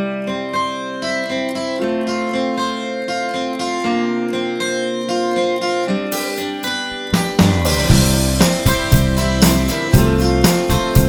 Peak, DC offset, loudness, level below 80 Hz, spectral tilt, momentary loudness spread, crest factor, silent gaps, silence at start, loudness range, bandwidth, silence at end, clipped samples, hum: 0 dBFS; under 0.1%; -17 LUFS; -26 dBFS; -5 dB/octave; 8 LU; 16 dB; none; 0 s; 6 LU; over 20 kHz; 0 s; under 0.1%; none